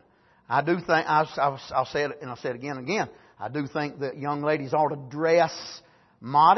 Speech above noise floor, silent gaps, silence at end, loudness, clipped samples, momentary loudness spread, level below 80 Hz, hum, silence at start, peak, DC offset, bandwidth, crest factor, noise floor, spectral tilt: 32 dB; none; 0 s; -26 LUFS; under 0.1%; 12 LU; -66 dBFS; none; 0.5 s; -6 dBFS; under 0.1%; 6.2 kHz; 20 dB; -57 dBFS; -5.5 dB/octave